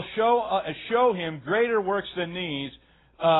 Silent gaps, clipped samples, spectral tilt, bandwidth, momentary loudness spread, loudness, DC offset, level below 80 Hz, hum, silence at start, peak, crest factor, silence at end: none; under 0.1%; -9.5 dB/octave; 4.1 kHz; 8 LU; -26 LUFS; under 0.1%; -60 dBFS; none; 0 s; -10 dBFS; 16 dB; 0 s